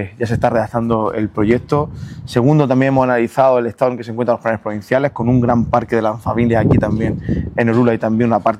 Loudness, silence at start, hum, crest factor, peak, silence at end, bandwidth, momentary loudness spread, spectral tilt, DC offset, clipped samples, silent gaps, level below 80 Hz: -16 LUFS; 0 s; none; 14 dB; 0 dBFS; 0 s; 12 kHz; 7 LU; -8.5 dB/octave; under 0.1%; under 0.1%; none; -38 dBFS